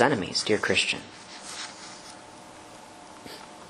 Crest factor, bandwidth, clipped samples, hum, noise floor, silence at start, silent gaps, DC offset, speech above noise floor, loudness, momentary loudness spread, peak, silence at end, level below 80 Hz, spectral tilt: 26 dB; 12.5 kHz; under 0.1%; none; -46 dBFS; 0 s; none; under 0.1%; 20 dB; -27 LUFS; 22 LU; -4 dBFS; 0 s; -66 dBFS; -3 dB/octave